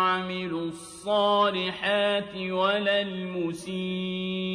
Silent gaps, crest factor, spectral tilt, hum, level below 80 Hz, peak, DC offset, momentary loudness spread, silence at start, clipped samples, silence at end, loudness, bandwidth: none; 16 dB; -5 dB/octave; none; -64 dBFS; -12 dBFS; under 0.1%; 9 LU; 0 s; under 0.1%; 0 s; -27 LUFS; 11 kHz